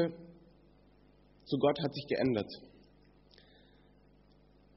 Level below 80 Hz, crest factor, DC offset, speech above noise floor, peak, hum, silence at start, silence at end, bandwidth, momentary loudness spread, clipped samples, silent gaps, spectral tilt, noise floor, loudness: -68 dBFS; 22 dB; under 0.1%; 31 dB; -16 dBFS; 50 Hz at -60 dBFS; 0 s; 2.1 s; 5.8 kHz; 23 LU; under 0.1%; none; -5 dB/octave; -64 dBFS; -34 LUFS